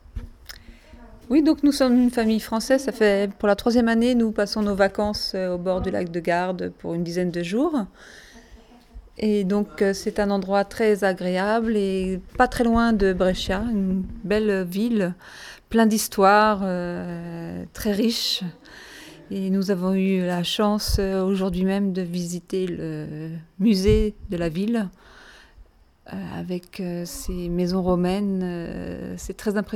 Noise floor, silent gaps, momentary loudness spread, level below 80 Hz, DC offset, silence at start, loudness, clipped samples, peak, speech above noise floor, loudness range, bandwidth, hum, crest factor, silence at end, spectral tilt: -51 dBFS; none; 14 LU; -40 dBFS; under 0.1%; 0.15 s; -23 LUFS; under 0.1%; -4 dBFS; 29 dB; 6 LU; 16.5 kHz; none; 20 dB; 0 s; -5.5 dB/octave